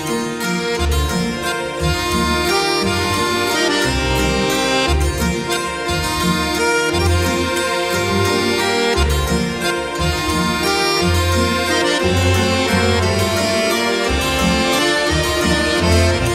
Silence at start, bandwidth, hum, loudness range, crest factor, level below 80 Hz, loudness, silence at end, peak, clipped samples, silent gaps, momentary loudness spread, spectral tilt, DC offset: 0 s; 16 kHz; none; 2 LU; 14 dB; -28 dBFS; -16 LUFS; 0 s; -2 dBFS; under 0.1%; none; 4 LU; -4 dB/octave; under 0.1%